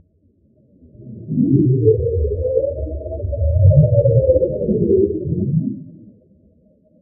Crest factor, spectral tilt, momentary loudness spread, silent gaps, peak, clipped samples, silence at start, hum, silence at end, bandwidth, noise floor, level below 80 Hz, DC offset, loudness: 16 dB; -20.5 dB/octave; 14 LU; none; 0 dBFS; under 0.1%; 1 s; none; 1.1 s; 0.8 kHz; -57 dBFS; -30 dBFS; under 0.1%; -17 LUFS